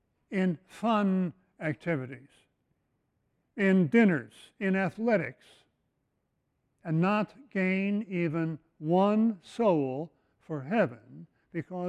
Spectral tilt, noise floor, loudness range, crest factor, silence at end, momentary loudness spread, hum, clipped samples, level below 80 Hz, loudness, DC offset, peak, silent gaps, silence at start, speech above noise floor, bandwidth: -8.5 dB/octave; -78 dBFS; 4 LU; 20 dB; 0 s; 15 LU; none; under 0.1%; -72 dBFS; -29 LUFS; under 0.1%; -10 dBFS; none; 0.3 s; 50 dB; 9.6 kHz